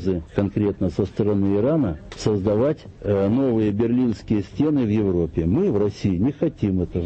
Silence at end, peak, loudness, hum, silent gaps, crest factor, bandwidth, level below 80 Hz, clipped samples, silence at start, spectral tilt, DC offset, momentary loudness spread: 0 s; -4 dBFS; -22 LUFS; none; none; 16 dB; 8.4 kHz; -42 dBFS; under 0.1%; 0 s; -8.5 dB/octave; under 0.1%; 5 LU